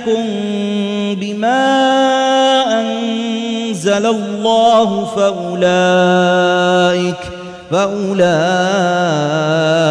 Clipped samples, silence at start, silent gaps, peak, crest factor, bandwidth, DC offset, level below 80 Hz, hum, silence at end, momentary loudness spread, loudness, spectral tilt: under 0.1%; 0 s; none; -2 dBFS; 12 dB; 11 kHz; under 0.1%; -54 dBFS; none; 0 s; 7 LU; -14 LUFS; -5 dB/octave